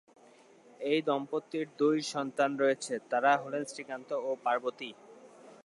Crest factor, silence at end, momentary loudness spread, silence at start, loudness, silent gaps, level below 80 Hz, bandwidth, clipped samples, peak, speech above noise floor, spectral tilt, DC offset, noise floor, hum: 18 dB; 0.1 s; 11 LU; 0.8 s; -32 LUFS; none; -88 dBFS; 11.5 kHz; under 0.1%; -14 dBFS; 28 dB; -4 dB/octave; under 0.1%; -59 dBFS; none